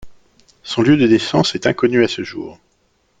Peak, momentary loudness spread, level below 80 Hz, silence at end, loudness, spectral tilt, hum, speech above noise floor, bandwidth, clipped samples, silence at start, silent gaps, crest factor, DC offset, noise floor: 0 dBFS; 18 LU; -52 dBFS; 0.65 s; -15 LUFS; -5.5 dB/octave; none; 46 dB; 9.2 kHz; under 0.1%; 0 s; none; 16 dB; under 0.1%; -61 dBFS